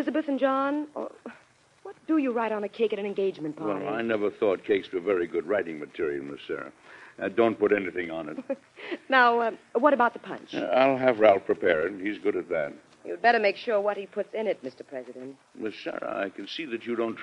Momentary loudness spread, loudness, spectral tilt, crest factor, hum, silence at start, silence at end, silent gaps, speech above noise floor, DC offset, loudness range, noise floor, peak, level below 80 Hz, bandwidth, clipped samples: 16 LU; -27 LUFS; -6 dB/octave; 22 dB; none; 0 s; 0 s; none; 32 dB; under 0.1%; 6 LU; -59 dBFS; -6 dBFS; -72 dBFS; 10 kHz; under 0.1%